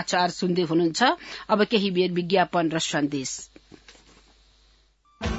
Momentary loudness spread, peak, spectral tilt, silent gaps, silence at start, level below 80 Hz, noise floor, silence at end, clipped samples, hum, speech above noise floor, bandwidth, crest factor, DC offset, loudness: 11 LU; -6 dBFS; -4.5 dB/octave; none; 0 s; -48 dBFS; -61 dBFS; 0 s; under 0.1%; none; 37 dB; 8 kHz; 20 dB; under 0.1%; -24 LUFS